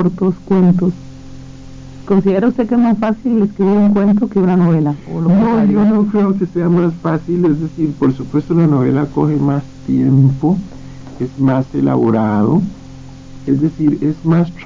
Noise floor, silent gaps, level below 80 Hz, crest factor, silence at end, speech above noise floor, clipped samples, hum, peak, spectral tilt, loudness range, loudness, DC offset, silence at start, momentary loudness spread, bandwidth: -33 dBFS; none; -42 dBFS; 12 dB; 0 s; 20 dB; under 0.1%; none; -2 dBFS; -10 dB/octave; 3 LU; -14 LUFS; under 0.1%; 0 s; 8 LU; 7.4 kHz